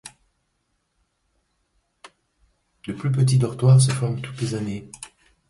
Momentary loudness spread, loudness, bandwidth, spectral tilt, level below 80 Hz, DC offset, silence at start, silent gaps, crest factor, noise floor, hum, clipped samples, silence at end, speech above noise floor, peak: 23 LU; -21 LUFS; 11.5 kHz; -6 dB/octave; -56 dBFS; under 0.1%; 0.05 s; none; 18 dB; -72 dBFS; none; under 0.1%; 0.45 s; 52 dB; -6 dBFS